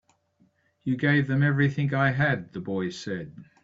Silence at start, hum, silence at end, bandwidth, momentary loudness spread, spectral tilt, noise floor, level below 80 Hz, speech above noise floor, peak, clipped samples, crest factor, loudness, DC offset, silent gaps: 0.85 s; none; 0.2 s; 7.6 kHz; 12 LU; -7.5 dB/octave; -66 dBFS; -60 dBFS; 41 dB; -10 dBFS; under 0.1%; 18 dB; -26 LUFS; under 0.1%; none